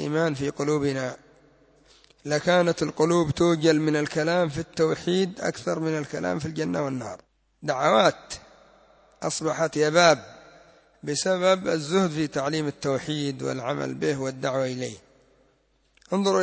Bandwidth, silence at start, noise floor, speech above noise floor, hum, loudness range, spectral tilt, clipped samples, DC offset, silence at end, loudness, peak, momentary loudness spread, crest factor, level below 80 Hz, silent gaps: 8 kHz; 0 s; -66 dBFS; 42 dB; none; 4 LU; -5 dB/octave; under 0.1%; under 0.1%; 0 s; -25 LUFS; -6 dBFS; 12 LU; 20 dB; -58 dBFS; none